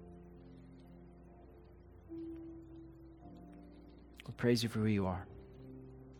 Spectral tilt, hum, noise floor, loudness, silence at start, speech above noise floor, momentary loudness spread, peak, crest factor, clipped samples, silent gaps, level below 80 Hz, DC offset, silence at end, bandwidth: -6 dB/octave; none; -58 dBFS; -38 LUFS; 0 s; 23 dB; 25 LU; -18 dBFS; 24 dB; under 0.1%; none; -62 dBFS; under 0.1%; 0 s; 17 kHz